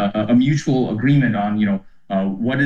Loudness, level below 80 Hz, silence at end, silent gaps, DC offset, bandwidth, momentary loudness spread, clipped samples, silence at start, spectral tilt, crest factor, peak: -18 LUFS; -48 dBFS; 0 s; none; 0.5%; 7.6 kHz; 7 LU; under 0.1%; 0 s; -7.5 dB/octave; 12 dB; -6 dBFS